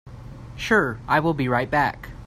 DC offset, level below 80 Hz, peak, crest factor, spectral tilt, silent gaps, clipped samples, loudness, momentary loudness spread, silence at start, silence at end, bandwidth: under 0.1%; -44 dBFS; -6 dBFS; 18 dB; -6 dB/octave; none; under 0.1%; -22 LUFS; 20 LU; 0.05 s; 0 s; 15.5 kHz